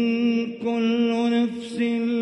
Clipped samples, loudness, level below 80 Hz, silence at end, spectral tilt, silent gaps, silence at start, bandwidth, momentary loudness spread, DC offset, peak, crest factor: under 0.1%; -23 LUFS; -70 dBFS; 0 s; -6 dB/octave; none; 0 s; 9 kHz; 5 LU; under 0.1%; -12 dBFS; 10 dB